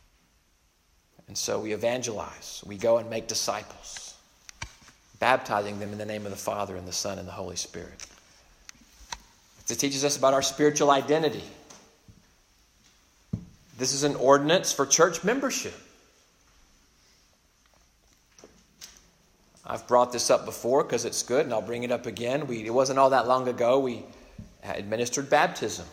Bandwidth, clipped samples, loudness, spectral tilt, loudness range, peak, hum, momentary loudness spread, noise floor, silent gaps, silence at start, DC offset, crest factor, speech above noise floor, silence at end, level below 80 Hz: 16 kHz; under 0.1%; -26 LUFS; -3 dB/octave; 9 LU; -6 dBFS; none; 20 LU; -66 dBFS; none; 1.3 s; under 0.1%; 24 dB; 40 dB; 0 s; -60 dBFS